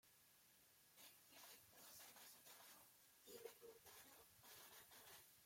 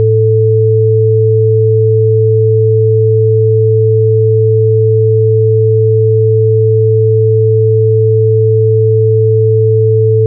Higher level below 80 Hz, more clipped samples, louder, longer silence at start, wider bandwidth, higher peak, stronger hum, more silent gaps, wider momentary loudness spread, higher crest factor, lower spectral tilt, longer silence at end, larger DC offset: second, under -90 dBFS vs -56 dBFS; neither; second, -63 LUFS vs -9 LUFS; about the same, 0.05 s vs 0 s; first, 16.5 kHz vs 0.5 kHz; second, -44 dBFS vs -2 dBFS; neither; neither; first, 5 LU vs 0 LU; first, 22 dB vs 6 dB; second, -1 dB/octave vs -20.5 dB/octave; about the same, 0 s vs 0 s; neither